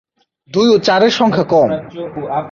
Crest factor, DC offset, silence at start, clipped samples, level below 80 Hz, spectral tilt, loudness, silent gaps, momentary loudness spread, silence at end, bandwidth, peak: 14 dB; under 0.1%; 0.55 s; under 0.1%; -54 dBFS; -5.5 dB/octave; -13 LUFS; none; 12 LU; 0 s; 7.2 kHz; -2 dBFS